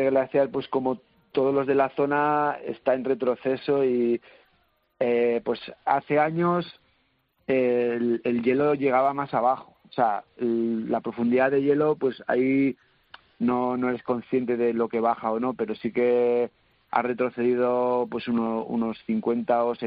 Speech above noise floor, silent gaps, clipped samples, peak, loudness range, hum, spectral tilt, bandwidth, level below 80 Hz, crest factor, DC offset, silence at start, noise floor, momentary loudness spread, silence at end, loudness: 45 dB; none; under 0.1%; -6 dBFS; 2 LU; none; -10.5 dB/octave; 5.2 kHz; -66 dBFS; 18 dB; under 0.1%; 0 s; -69 dBFS; 7 LU; 0 s; -25 LUFS